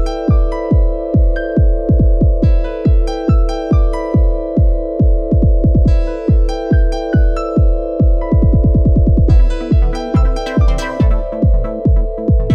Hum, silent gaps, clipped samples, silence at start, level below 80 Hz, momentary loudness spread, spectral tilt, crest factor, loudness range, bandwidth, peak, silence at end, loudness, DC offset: none; none; under 0.1%; 0 s; -14 dBFS; 4 LU; -9 dB/octave; 10 dB; 1 LU; 6.8 kHz; 0 dBFS; 0 s; -14 LUFS; under 0.1%